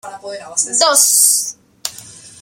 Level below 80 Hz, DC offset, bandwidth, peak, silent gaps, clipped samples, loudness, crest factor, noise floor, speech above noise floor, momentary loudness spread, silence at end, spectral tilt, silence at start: -66 dBFS; under 0.1%; over 20 kHz; 0 dBFS; none; under 0.1%; -11 LUFS; 16 dB; -38 dBFS; 23 dB; 19 LU; 0.15 s; 1.5 dB/octave; 0.05 s